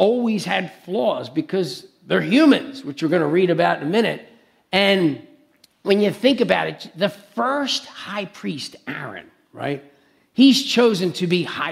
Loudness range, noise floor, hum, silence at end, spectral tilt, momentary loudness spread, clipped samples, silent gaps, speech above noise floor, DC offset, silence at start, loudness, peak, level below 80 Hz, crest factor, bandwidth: 6 LU; -56 dBFS; none; 0 s; -5 dB/octave; 15 LU; under 0.1%; none; 37 dB; under 0.1%; 0 s; -20 LUFS; -2 dBFS; -68 dBFS; 18 dB; 15 kHz